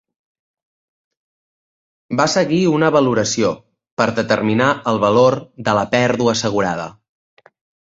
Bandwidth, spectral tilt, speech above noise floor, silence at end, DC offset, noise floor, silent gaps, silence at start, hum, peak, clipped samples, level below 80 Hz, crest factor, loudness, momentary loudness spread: 8 kHz; -5 dB/octave; over 74 dB; 0.9 s; under 0.1%; under -90 dBFS; 3.92-3.97 s; 2.1 s; none; -2 dBFS; under 0.1%; -54 dBFS; 18 dB; -17 LUFS; 8 LU